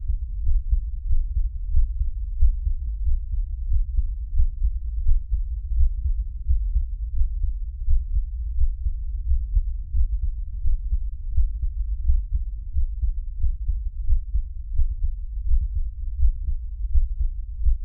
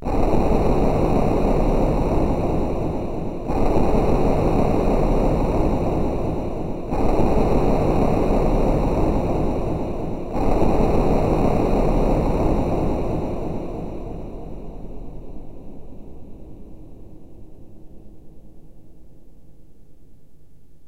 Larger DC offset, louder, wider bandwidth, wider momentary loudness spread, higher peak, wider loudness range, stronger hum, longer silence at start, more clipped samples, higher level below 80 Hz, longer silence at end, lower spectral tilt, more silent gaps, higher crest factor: second, under 0.1% vs 1%; second, -29 LUFS vs -22 LUFS; second, 0.2 kHz vs 11 kHz; second, 5 LU vs 18 LU; about the same, -6 dBFS vs -4 dBFS; second, 1 LU vs 15 LU; neither; about the same, 0 s vs 0 s; neither; about the same, -22 dBFS vs -26 dBFS; second, 0 s vs 1.6 s; first, -12 dB/octave vs -8.5 dB/octave; neither; about the same, 14 dB vs 16 dB